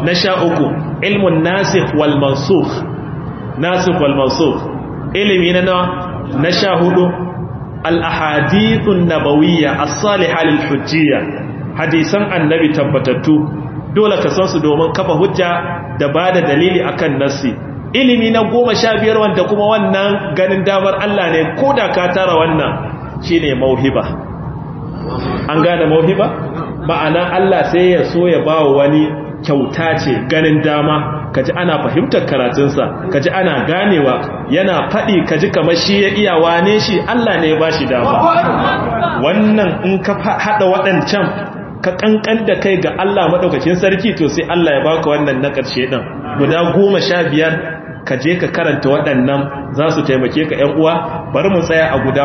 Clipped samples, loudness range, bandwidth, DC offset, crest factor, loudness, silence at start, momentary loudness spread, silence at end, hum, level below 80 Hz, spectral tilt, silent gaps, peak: under 0.1%; 2 LU; 6.4 kHz; under 0.1%; 12 dB; -13 LUFS; 0 s; 8 LU; 0 s; none; -40 dBFS; -6 dB/octave; none; 0 dBFS